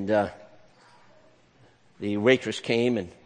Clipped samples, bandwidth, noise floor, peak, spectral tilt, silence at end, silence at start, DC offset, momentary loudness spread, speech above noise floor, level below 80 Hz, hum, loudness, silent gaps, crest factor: under 0.1%; 9.8 kHz; -59 dBFS; -4 dBFS; -5.5 dB/octave; 0.15 s; 0 s; under 0.1%; 10 LU; 34 dB; -64 dBFS; none; -25 LUFS; none; 22 dB